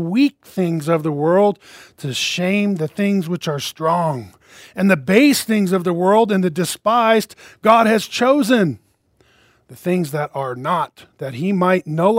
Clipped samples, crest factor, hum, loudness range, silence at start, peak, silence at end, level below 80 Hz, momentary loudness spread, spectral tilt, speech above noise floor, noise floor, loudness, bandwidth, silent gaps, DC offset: under 0.1%; 18 dB; none; 5 LU; 0 s; 0 dBFS; 0 s; -64 dBFS; 11 LU; -5.5 dB/octave; 41 dB; -58 dBFS; -17 LUFS; 16 kHz; none; under 0.1%